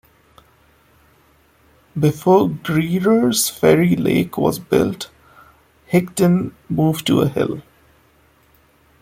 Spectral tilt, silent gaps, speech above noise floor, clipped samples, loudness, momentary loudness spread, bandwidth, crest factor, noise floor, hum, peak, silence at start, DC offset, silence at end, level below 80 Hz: -5.5 dB/octave; none; 38 dB; under 0.1%; -17 LUFS; 9 LU; 16.5 kHz; 18 dB; -55 dBFS; none; -2 dBFS; 1.95 s; under 0.1%; 1.4 s; -50 dBFS